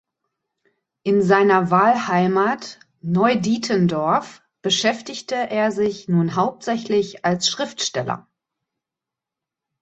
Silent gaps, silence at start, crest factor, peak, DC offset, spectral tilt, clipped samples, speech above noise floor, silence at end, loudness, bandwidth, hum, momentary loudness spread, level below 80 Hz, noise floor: none; 1.05 s; 20 dB; -2 dBFS; under 0.1%; -5 dB/octave; under 0.1%; 67 dB; 1.6 s; -20 LUFS; 8.2 kHz; none; 13 LU; -62 dBFS; -87 dBFS